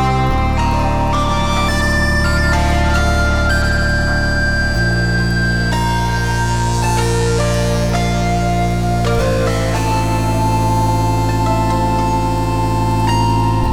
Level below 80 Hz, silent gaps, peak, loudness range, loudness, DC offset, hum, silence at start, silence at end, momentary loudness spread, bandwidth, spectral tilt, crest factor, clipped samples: -22 dBFS; none; -2 dBFS; 1 LU; -16 LUFS; 4%; none; 0 s; 0 s; 2 LU; 16.5 kHz; -5.5 dB/octave; 12 dB; under 0.1%